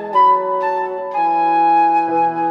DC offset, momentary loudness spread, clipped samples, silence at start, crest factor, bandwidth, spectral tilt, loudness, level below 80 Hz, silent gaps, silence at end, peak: under 0.1%; 7 LU; under 0.1%; 0 s; 10 dB; 6.2 kHz; -6.5 dB/octave; -15 LUFS; -68 dBFS; none; 0 s; -4 dBFS